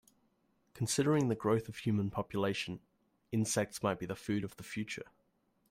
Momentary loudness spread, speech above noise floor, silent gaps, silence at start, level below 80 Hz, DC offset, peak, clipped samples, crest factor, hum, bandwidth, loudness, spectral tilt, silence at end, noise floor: 11 LU; 41 dB; none; 0.75 s; -68 dBFS; under 0.1%; -18 dBFS; under 0.1%; 18 dB; none; 16 kHz; -35 LUFS; -5 dB/octave; 0.65 s; -76 dBFS